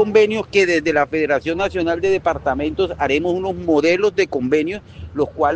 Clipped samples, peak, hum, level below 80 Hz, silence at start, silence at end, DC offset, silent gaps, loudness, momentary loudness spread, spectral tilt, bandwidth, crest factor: under 0.1%; 0 dBFS; none; -44 dBFS; 0 s; 0 s; under 0.1%; none; -18 LUFS; 6 LU; -5.5 dB/octave; 8.8 kHz; 18 dB